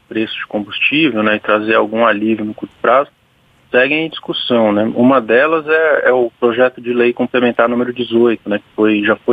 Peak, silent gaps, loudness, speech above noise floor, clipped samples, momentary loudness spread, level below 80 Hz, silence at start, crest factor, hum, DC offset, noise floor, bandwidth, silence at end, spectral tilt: 0 dBFS; none; -14 LUFS; 39 dB; under 0.1%; 8 LU; -58 dBFS; 0.1 s; 14 dB; none; under 0.1%; -53 dBFS; 5 kHz; 0 s; -7.5 dB/octave